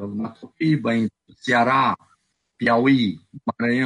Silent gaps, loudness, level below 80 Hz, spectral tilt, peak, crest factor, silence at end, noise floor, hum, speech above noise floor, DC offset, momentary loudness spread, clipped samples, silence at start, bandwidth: none; -21 LUFS; -64 dBFS; -6.5 dB/octave; -6 dBFS; 16 dB; 0 s; -65 dBFS; none; 45 dB; under 0.1%; 14 LU; under 0.1%; 0 s; 10 kHz